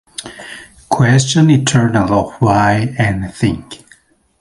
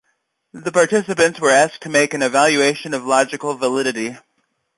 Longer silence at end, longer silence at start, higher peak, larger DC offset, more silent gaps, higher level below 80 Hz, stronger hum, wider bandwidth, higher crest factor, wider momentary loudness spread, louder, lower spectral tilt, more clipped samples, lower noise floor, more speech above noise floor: about the same, 0.65 s vs 0.6 s; second, 0.2 s vs 0.55 s; about the same, 0 dBFS vs -2 dBFS; neither; neither; first, -38 dBFS vs -64 dBFS; neither; about the same, 11.5 kHz vs 11.5 kHz; about the same, 14 dB vs 16 dB; first, 20 LU vs 8 LU; first, -13 LUFS vs -17 LUFS; first, -5.5 dB/octave vs -3 dB/octave; neither; second, -49 dBFS vs -69 dBFS; second, 37 dB vs 52 dB